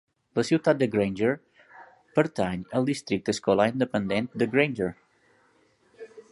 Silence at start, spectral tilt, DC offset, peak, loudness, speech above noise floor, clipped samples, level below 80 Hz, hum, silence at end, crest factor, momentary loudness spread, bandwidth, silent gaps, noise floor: 0.35 s; -6 dB/octave; under 0.1%; -6 dBFS; -26 LUFS; 39 dB; under 0.1%; -60 dBFS; none; 0.1 s; 20 dB; 9 LU; 11.5 kHz; none; -64 dBFS